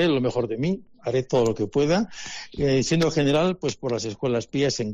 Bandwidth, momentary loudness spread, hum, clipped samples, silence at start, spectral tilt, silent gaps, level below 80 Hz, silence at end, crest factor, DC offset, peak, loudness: 10 kHz; 7 LU; none; under 0.1%; 0 s; -5.5 dB/octave; none; -50 dBFS; 0 s; 12 dB; under 0.1%; -10 dBFS; -24 LUFS